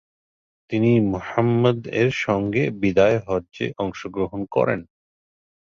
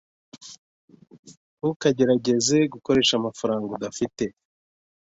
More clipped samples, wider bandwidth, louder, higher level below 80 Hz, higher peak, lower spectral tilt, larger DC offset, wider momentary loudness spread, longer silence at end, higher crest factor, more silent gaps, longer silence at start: neither; about the same, 7.4 kHz vs 8 kHz; about the same, -22 LUFS vs -23 LUFS; first, -50 dBFS vs -60 dBFS; about the same, -4 dBFS vs -6 dBFS; first, -7.5 dB/octave vs -4 dB/octave; neither; second, 9 LU vs 20 LU; about the same, 0.75 s vs 0.85 s; about the same, 18 dB vs 20 dB; second, none vs 0.58-0.88 s, 1.19-1.23 s, 1.37-1.57 s, 1.76-1.80 s; first, 0.7 s vs 0.35 s